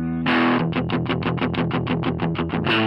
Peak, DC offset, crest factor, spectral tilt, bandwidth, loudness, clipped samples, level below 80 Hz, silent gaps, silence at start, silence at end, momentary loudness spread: -8 dBFS; under 0.1%; 14 dB; -8.5 dB/octave; 5.8 kHz; -22 LUFS; under 0.1%; -46 dBFS; none; 0 s; 0 s; 5 LU